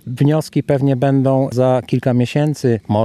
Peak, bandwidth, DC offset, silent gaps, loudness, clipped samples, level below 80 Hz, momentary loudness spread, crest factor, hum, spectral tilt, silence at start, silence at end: -2 dBFS; 13.5 kHz; under 0.1%; none; -16 LUFS; under 0.1%; -56 dBFS; 3 LU; 14 dB; none; -8 dB/octave; 0.05 s; 0 s